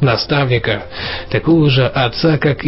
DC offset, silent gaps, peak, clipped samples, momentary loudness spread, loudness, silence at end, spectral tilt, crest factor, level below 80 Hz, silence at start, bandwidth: under 0.1%; none; -2 dBFS; under 0.1%; 9 LU; -15 LUFS; 0 s; -10 dB/octave; 12 dB; -36 dBFS; 0 s; 5.8 kHz